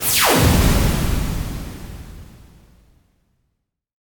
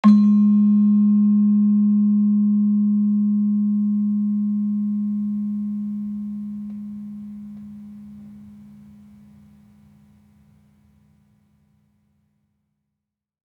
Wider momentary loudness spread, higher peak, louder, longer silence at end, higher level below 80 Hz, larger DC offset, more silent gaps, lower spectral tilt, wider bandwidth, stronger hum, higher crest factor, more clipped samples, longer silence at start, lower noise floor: about the same, 23 LU vs 21 LU; about the same, -2 dBFS vs -4 dBFS; about the same, -17 LUFS vs -19 LUFS; second, 1.85 s vs 5 s; first, -26 dBFS vs -68 dBFS; neither; neither; second, -4 dB/octave vs -10.5 dB/octave; first, 19.5 kHz vs 4.3 kHz; neither; about the same, 18 dB vs 16 dB; neither; about the same, 0 s vs 0.05 s; second, -73 dBFS vs -83 dBFS